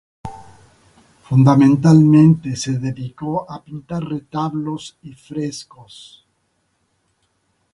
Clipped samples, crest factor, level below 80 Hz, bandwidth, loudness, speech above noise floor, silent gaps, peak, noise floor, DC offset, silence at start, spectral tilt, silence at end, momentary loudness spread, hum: under 0.1%; 18 dB; -52 dBFS; 11 kHz; -16 LUFS; 51 dB; none; 0 dBFS; -67 dBFS; under 0.1%; 0.25 s; -7.5 dB/octave; 2.1 s; 22 LU; none